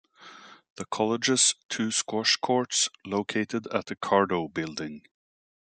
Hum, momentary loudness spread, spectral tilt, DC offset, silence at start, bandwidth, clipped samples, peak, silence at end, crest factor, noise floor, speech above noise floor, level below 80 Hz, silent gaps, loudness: none; 12 LU; -2.5 dB/octave; under 0.1%; 0.2 s; 9.6 kHz; under 0.1%; -6 dBFS; 0.8 s; 22 dB; -50 dBFS; 22 dB; -74 dBFS; 0.70-0.76 s, 1.65-1.69 s; -26 LUFS